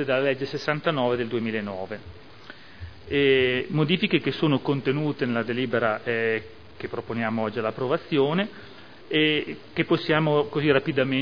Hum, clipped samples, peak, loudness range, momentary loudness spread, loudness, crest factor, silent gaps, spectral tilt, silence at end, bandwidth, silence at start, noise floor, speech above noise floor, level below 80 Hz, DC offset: none; under 0.1%; -4 dBFS; 3 LU; 14 LU; -25 LUFS; 20 dB; none; -7.5 dB/octave; 0 s; 5.4 kHz; 0 s; -46 dBFS; 22 dB; -58 dBFS; 0.4%